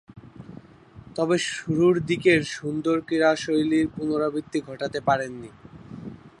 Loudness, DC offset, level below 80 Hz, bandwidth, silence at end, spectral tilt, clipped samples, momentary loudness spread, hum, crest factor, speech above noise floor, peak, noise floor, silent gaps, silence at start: -24 LUFS; under 0.1%; -58 dBFS; 11 kHz; 0.1 s; -5.5 dB/octave; under 0.1%; 21 LU; none; 18 dB; 24 dB; -6 dBFS; -48 dBFS; none; 0.15 s